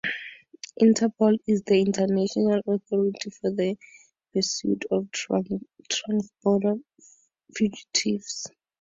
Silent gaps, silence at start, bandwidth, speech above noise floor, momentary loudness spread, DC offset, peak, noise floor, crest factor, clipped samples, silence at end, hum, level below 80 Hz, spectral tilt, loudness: none; 0.05 s; 7.8 kHz; 21 dB; 13 LU; under 0.1%; -8 dBFS; -45 dBFS; 18 dB; under 0.1%; 0.35 s; none; -66 dBFS; -4.5 dB/octave; -25 LUFS